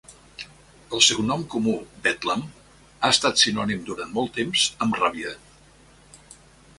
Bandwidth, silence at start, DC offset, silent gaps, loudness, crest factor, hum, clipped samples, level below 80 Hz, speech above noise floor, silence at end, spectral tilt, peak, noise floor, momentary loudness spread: 11.5 kHz; 0.1 s; under 0.1%; none; -22 LUFS; 22 dB; none; under 0.1%; -56 dBFS; 29 dB; 0.45 s; -2 dB/octave; -2 dBFS; -53 dBFS; 22 LU